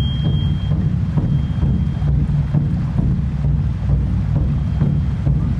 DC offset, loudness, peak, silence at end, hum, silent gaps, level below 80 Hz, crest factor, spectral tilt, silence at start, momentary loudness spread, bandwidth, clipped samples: under 0.1%; -19 LUFS; -4 dBFS; 0 s; none; none; -22 dBFS; 14 dB; -9.5 dB/octave; 0 s; 1 LU; 5.6 kHz; under 0.1%